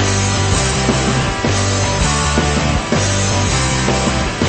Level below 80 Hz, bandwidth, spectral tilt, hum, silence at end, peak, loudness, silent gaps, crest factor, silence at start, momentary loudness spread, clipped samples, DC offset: -24 dBFS; 8.8 kHz; -4 dB/octave; none; 0 s; 0 dBFS; -15 LUFS; none; 14 dB; 0 s; 1 LU; under 0.1%; 0.6%